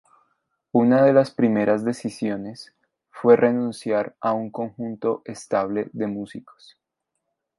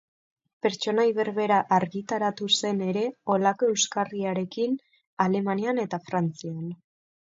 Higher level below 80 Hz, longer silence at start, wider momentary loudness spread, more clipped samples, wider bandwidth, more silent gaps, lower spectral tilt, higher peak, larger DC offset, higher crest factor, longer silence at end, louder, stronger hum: first, -68 dBFS vs -74 dBFS; about the same, 0.75 s vs 0.65 s; first, 15 LU vs 7 LU; neither; first, 11.5 kHz vs 8 kHz; second, none vs 5.07-5.17 s; first, -7 dB/octave vs -4 dB/octave; first, -2 dBFS vs -8 dBFS; neither; about the same, 20 dB vs 18 dB; first, 1.2 s vs 0.55 s; first, -22 LUFS vs -26 LUFS; neither